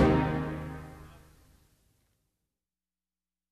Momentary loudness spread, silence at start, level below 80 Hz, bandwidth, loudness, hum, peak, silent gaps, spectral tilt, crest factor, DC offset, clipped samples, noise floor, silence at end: 25 LU; 0 s; -46 dBFS; 13.5 kHz; -31 LUFS; none; -10 dBFS; none; -8 dB/octave; 22 dB; under 0.1%; under 0.1%; under -90 dBFS; 2.4 s